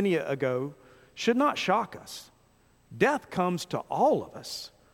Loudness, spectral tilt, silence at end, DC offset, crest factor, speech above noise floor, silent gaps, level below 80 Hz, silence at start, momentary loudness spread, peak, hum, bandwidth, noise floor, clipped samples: -28 LUFS; -5 dB/octave; 0.25 s; under 0.1%; 20 dB; 35 dB; none; -66 dBFS; 0 s; 14 LU; -8 dBFS; none; 16.5 kHz; -63 dBFS; under 0.1%